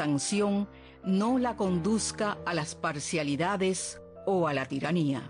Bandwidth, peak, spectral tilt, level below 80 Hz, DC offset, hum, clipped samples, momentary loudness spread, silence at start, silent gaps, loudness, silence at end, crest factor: 10.5 kHz; -18 dBFS; -5 dB/octave; -58 dBFS; under 0.1%; none; under 0.1%; 6 LU; 0 s; none; -30 LUFS; 0 s; 12 dB